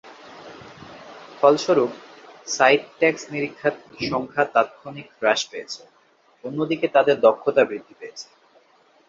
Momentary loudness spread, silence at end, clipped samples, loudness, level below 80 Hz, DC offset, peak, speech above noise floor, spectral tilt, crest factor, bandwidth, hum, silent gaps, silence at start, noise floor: 24 LU; 0.85 s; under 0.1%; -21 LUFS; -66 dBFS; under 0.1%; -2 dBFS; 37 dB; -4 dB/octave; 22 dB; 7.8 kHz; none; none; 0.05 s; -59 dBFS